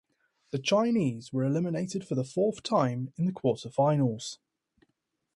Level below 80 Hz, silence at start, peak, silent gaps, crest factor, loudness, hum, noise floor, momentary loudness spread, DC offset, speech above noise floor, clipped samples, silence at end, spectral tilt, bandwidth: -70 dBFS; 0.55 s; -12 dBFS; none; 18 dB; -29 LUFS; none; -80 dBFS; 8 LU; under 0.1%; 52 dB; under 0.1%; 1 s; -6.5 dB/octave; 11.5 kHz